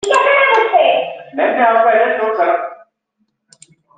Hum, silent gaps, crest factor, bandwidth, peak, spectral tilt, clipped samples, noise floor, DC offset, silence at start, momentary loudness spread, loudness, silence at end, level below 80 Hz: none; none; 14 dB; 9.2 kHz; 0 dBFS; -2 dB/octave; under 0.1%; -67 dBFS; under 0.1%; 0.05 s; 9 LU; -13 LUFS; 1.25 s; -66 dBFS